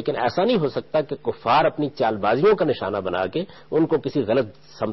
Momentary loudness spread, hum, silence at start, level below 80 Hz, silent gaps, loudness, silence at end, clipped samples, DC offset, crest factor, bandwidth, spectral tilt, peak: 8 LU; none; 0 s; -54 dBFS; none; -22 LUFS; 0 s; under 0.1%; 0.2%; 14 dB; 6 kHz; -4.5 dB/octave; -8 dBFS